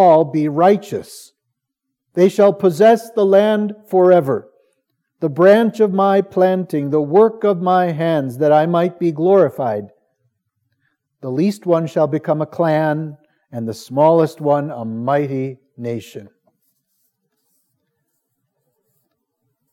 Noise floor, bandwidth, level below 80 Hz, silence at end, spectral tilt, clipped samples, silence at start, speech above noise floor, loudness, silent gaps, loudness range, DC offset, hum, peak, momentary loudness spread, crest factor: -78 dBFS; 15.5 kHz; -74 dBFS; 3.45 s; -7.5 dB/octave; under 0.1%; 0 s; 63 dB; -16 LUFS; none; 8 LU; under 0.1%; none; 0 dBFS; 14 LU; 16 dB